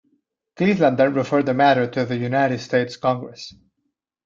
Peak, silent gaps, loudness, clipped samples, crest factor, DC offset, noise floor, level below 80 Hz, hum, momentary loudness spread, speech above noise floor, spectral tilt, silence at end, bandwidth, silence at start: -4 dBFS; none; -20 LUFS; under 0.1%; 16 dB; under 0.1%; -76 dBFS; -62 dBFS; none; 11 LU; 56 dB; -7 dB/octave; 0.75 s; 7.6 kHz; 0.6 s